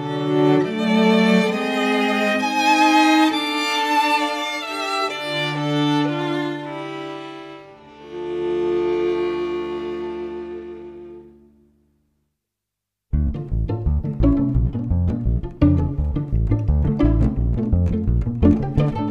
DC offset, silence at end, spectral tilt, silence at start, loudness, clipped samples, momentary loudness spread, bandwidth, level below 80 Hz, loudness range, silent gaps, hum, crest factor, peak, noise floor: under 0.1%; 0 s; -6 dB/octave; 0 s; -20 LUFS; under 0.1%; 14 LU; 15.5 kHz; -28 dBFS; 12 LU; none; none; 18 dB; -2 dBFS; -82 dBFS